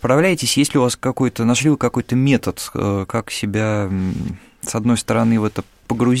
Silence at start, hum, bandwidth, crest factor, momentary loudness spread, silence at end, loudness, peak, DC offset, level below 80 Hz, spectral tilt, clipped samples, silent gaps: 0.05 s; none; 16 kHz; 14 dB; 9 LU; 0 s; -18 LUFS; -4 dBFS; under 0.1%; -46 dBFS; -5 dB/octave; under 0.1%; none